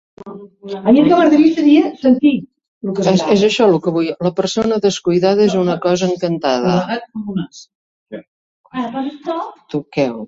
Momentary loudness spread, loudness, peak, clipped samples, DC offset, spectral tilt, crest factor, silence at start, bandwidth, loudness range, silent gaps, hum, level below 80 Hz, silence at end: 18 LU; -15 LUFS; -2 dBFS; under 0.1%; under 0.1%; -6 dB/octave; 14 dB; 0.2 s; 7.8 kHz; 9 LU; 2.68-2.81 s, 7.75-8.06 s, 8.28-8.64 s; none; -54 dBFS; 0 s